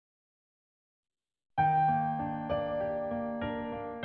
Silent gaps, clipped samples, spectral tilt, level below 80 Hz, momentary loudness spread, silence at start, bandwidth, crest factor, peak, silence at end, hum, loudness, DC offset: none; under 0.1%; -5.5 dB/octave; -60 dBFS; 10 LU; 1.6 s; 4.5 kHz; 16 dB; -18 dBFS; 0 s; none; -32 LUFS; under 0.1%